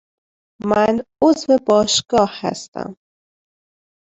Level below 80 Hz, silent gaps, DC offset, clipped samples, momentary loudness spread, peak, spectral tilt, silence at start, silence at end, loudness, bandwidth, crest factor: -54 dBFS; 2.68-2.72 s; under 0.1%; under 0.1%; 15 LU; -2 dBFS; -4 dB/octave; 0.65 s; 1.15 s; -17 LUFS; 8.4 kHz; 16 dB